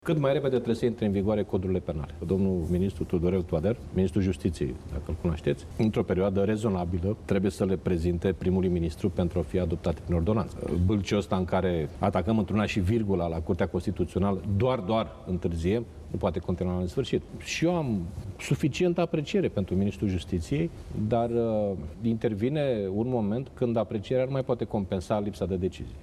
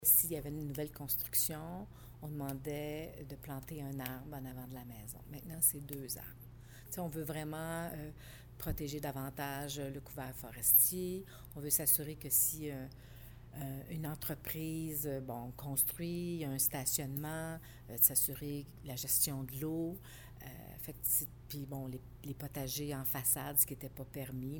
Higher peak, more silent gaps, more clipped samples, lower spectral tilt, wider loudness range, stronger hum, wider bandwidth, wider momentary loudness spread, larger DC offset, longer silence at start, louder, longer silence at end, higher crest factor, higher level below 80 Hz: about the same, -10 dBFS vs -12 dBFS; neither; neither; first, -7.5 dB/octave vs -3.5 dB/octave; second, 2 LU vs 11 LU; neither; second, 13 kHz vs 19 kHz; second, 5 LU vs 19 LU; neither; about the same, 0.05 s vs 0 s; first, -28 LUFS vs -35 LUFS; about the same, 0 s vs 0 s; second, 18 dB vs 26 dB; first, -46 dBFS vs -58 dBFS